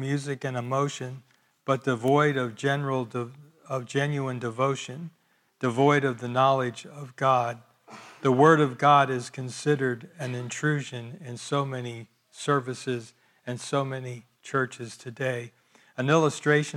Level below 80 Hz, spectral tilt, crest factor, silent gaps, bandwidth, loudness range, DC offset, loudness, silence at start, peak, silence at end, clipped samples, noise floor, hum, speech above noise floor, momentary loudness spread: -76 dBFS; -5.5 dB/octave; 22 dB; none; 12.5 kHz; 8 LU; under 0.1%; -26 LUFS; 0 s; -6 dBFS; 0 s; under 0.1%; -48 dBFS; none; 22 dB; 18 LU